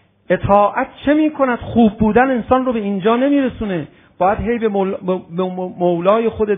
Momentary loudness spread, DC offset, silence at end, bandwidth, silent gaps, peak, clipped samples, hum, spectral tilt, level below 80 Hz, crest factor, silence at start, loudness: 8 LU; under 0.1%; 0 s; 3.8 kHz; none; 0 dBFS; under 0.1%; none; -10.5 dB/octave; -40 dBFS; 16 dB; 0.3 s; -16 LUFS